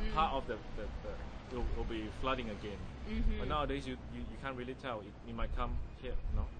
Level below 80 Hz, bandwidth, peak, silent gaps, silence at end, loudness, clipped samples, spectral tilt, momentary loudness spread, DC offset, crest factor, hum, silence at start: -40 dBFS; 9.4 kHz; -18 dBFS; none; 0 s; -41 LUFS; under 0.1%; -6.5 dB/octave; 9 LU; under 0.1%; 18 dB; none; 0 s